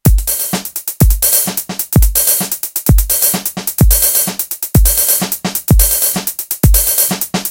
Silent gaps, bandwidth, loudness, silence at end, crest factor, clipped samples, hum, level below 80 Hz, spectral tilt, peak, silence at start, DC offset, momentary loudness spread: none; 17.5 kHz; -12 LUFS; 0 s; 12 dB; 0.1%; none; -16 dBFS; -3.5 dB/octave; 0 dBFS; 0.05 s; under 0.1%; 8 LU